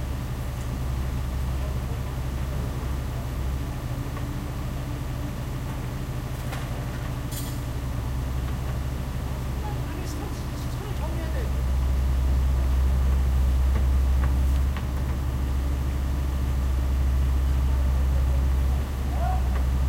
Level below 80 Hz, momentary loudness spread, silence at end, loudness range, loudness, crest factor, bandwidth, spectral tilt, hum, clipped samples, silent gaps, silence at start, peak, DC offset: -26 dBFS; 8 LU; 0 s; 7 LU; -28 LUFS; 12 dB; 16 kHz; -6.5 dB/octave; none; under 0.1%; none; 0 s; -12 dBFS; under 0.1%